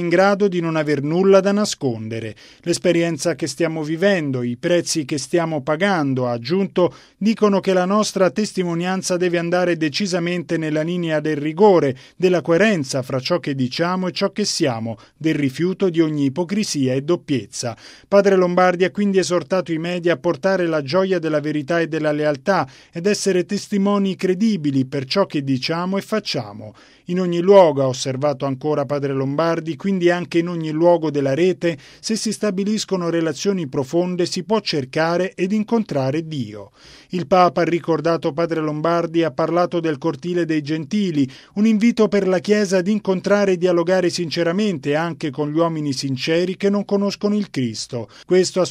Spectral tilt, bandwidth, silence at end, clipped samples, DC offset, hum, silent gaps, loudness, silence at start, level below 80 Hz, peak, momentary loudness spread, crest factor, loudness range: -5.5 dB/octave; 14.5 kHz; 0 s; under 0.1%; under 0.1%; none; none; -19 LUFS; 0 s; -62 dBFS; 0 dBFS; 7 LU; 18 dB; 3 LU